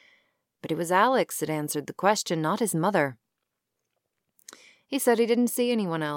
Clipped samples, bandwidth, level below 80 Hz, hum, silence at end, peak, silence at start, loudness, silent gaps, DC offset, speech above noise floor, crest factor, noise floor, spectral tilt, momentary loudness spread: under 0.1%; 17 kHz; -80 dBFS; none; 0 s; -8 dBFS; 0.65 s; -25 LUFS; none; under 0.1%; 57 dB; 20 dB; -82 dBFS; -4.5 dB/octave; 9 LU